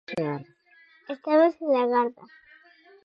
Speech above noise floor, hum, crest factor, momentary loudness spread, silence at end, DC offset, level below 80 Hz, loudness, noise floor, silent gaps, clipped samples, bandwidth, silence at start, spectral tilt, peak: 34 dB; none; 18 dB; 15 LU; 0.95 s; under 0.1%; -74 dBFS; -24 LUFS; -58 dBFS; none; under 0.1%; 6.8 kHz; 0.1 s; -7.5 dB/octave; -10 dBFS